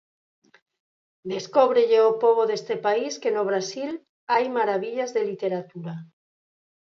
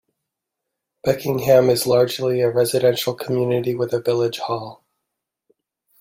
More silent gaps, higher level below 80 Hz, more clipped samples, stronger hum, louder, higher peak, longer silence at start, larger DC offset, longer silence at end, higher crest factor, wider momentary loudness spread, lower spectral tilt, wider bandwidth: first, 4.09-4.27 s vs none; second, -80 dBFS vs -60 dBFS; neither; neither; second, -23 LUFS vs -19 LUFS; about the same, -4 dBFS vs -2 dBFS; first, 1.25 s vs 1.05 s; neither; second, 0.75 s vs 1.25 s; about the same, 20 dB vs 18 dB; first, 17 LU vs 11 LU; about the same, -4.5 dB/octave vs -5.5 dB/octave; second, 7.4 kHz vs 16.5 kHz